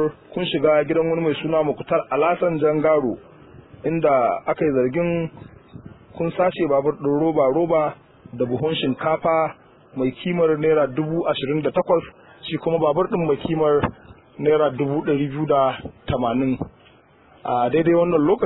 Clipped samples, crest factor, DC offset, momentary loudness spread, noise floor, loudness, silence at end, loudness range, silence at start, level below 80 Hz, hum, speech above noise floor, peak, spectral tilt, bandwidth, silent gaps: under 0.1%; 16 dB; under 0.1%; 9 LU; -52 dBFS; -21 LUFS; 0 s; 2 LU; 0 s; -52 dBFS; none; 32 dB; -6 dBFS; -11 dB/octave; 4.1 kHz; none